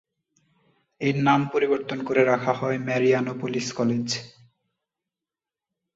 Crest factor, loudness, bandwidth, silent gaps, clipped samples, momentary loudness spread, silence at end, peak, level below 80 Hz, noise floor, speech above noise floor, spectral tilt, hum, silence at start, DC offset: 20 dB; -24 LUFS; 8 kHz; none; under 0.1%; 7 LU; 1.65 s; -6 dBFS; -66 dBFS; -90 dBFS; 66 dB; -5.5 dB/octave; none; 1 s; under 0.1%